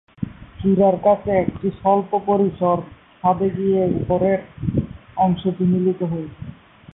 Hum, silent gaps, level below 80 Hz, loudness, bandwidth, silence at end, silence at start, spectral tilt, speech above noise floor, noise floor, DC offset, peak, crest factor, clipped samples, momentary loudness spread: none; none; -44 dBFS; -20 LUFS; 3.9 kHz; 0.45 s; 0.2 s; -13 dB/octave; 21 dB; -40 dBFS; under 0.1%; -6 dBFS; 14 dB; under 0.1%; 15 LU